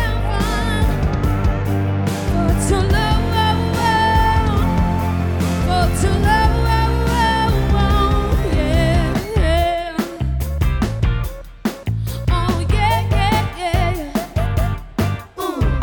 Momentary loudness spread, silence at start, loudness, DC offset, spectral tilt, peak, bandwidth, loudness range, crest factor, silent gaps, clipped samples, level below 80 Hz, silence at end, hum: 7 LU; 0 s; -18 LUFS; under 0.1%; -6 dB/octave; -2 dBFS; over 20 kHz; 3 LU; 14 dB; none; under 0.1%; -22 dBFS; 0 s; none